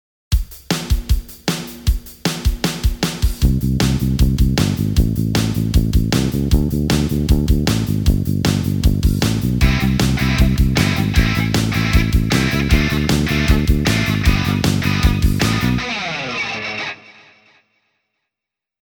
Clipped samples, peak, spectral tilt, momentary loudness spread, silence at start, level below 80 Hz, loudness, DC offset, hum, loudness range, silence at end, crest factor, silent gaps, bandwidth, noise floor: under 0.1%; 0 dBFS; -5.5 dB/octave; 7 LU; 0.3 s; -22 dBFS; -18 LUFS; under 0.1%; none; 4 LU; 1.7 s; 16 dB; none; over 20 kHz; -85 dBFS